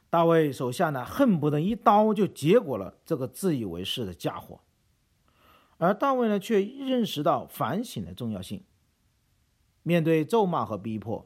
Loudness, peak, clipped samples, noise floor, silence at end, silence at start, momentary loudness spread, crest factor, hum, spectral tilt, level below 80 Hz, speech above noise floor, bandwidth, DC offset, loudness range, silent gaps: -26 LUFS; -6 dBFS; under 0.1%; -69 dBFS; 0.05 s; 0.1 s; 13 LU; 20 dB; none; -6.5 dB/octave; -62 dBFS; 43 dB; 16.5 kHz; under 0.1%; 6 LU; none